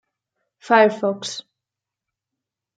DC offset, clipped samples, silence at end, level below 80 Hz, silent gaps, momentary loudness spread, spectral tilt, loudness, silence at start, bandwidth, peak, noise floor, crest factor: under 0.1%; under 0.1%; 1.4 s; -76 dBFS; none; 15 LU; -4 dB/octave; -18 LUFS; 0.65 s; 9.4 kHz; -2 dBFS; -86 dBFS; 20 dB